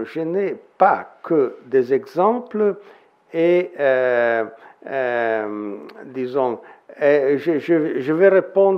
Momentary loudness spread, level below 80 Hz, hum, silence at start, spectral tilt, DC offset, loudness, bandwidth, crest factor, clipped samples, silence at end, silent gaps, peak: 13 LU; -78 dBFS; none; 0 s; -8 dB/octave; under 0.1%; -19 LUFS; 6 kHz; 18 dB; under 0.1%; 0 s; none; -2 dBFS